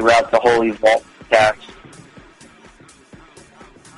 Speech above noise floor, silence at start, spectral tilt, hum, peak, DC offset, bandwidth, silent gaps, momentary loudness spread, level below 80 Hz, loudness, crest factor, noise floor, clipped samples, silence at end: 31 dB; 0 s; -4 dB/octave; none; 0 dBFS; under 0.1%; 11.5 kHz; none; 11 LU; -50 dBFS; -15 LUFS; 18 dB; -46 dBFS; under 0.1%; 2.45 s